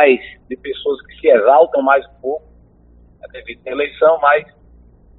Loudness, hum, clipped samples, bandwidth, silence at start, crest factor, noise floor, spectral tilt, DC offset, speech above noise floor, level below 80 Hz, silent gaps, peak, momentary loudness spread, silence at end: -15 LUFS; none; under 0.1%; 4.1 kHz; 0 s; 16 dB; -47 dBFS; -1.5 dB/octave; under 0.1%; 32 dB; -50 dBFS; none; 0 dBFS; 20 LU; 0.75 s